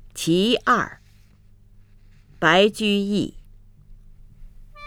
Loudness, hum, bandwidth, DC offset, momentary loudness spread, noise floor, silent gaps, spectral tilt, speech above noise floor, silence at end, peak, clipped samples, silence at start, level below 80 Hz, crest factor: -20 LUFS; none; 17 kHz; under 0.1%; 10 LU; -51 dBFS; none; -4.5 dB/octave; 32 dB; 0 s; -2 dBFS; under 0.1%; 0.15 s; -48 dBFS; 22 dB